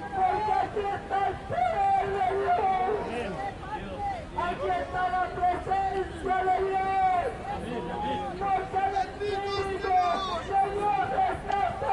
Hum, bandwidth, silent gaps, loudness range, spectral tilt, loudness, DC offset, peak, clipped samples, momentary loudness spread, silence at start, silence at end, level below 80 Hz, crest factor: none; 11 kHz; none; 2 LU; -5.5 dB/octave; -28 LUFS; under 0.1%; -16 dBFS; under 0.1%; 8 LU; 0 s; 0 s; -48 dBFS; 12 dB